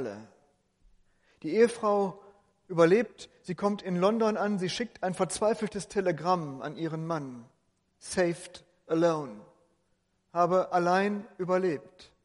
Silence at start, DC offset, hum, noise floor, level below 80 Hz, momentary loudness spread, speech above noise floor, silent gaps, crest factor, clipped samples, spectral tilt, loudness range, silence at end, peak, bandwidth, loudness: 0 s; under 0.1%; none; -74 dBFS; -68 dBFS; 14 LU; 46 dB; none; 22 dB; under 0.1%; -5.5 dB/octave; 5 LU; 0.2 s; -8 dBFS; 11.5 kHz; -29 LUFS